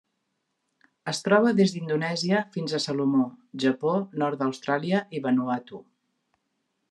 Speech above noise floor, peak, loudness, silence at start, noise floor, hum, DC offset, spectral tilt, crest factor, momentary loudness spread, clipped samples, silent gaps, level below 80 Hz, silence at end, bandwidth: 53 dB; -6 dBFS; -26 LUFS; 1.05 s; -78 dBFS; none; under 0.1%; -5.5 dB/octave; 22 dB; 10 LU; under 0.1%; none; -76 dBFS; 1.1 s; 11.5 kHz